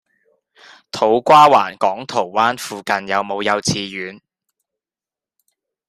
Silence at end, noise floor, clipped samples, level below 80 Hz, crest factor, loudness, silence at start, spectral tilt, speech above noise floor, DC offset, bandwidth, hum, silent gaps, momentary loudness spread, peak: 1.75 s; under -90 dBFS; under 0.1%; -62 dBFS; 18 dB; -16 LUFS; 0.95 s; -3.5 dB/octave; over 74 dB; under 0.1%; 15.5 kHz; none; none; 17 LU; 0 dBFS